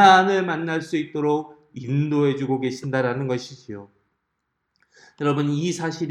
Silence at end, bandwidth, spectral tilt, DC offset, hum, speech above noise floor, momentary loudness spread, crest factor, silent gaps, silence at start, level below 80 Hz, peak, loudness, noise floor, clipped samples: 0 s; 11 kHz; -6 dB/octave; under 0.1%; none; 55 dB; 16 LU; 22 dB; none; 0 s; -70 dBFS; -2 dBFS; -23 LUFS; -76 dBFS; under 0.1%